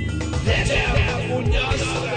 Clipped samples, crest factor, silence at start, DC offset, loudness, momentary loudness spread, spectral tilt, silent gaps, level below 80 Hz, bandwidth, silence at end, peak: under 0.1%; 14 dB; 0 s; under 0.1%; -21 LUFS; 4 LU; -5 dB/octave; none; -26 dBFS; 9.6 kHz; 0 s; -6 dBFS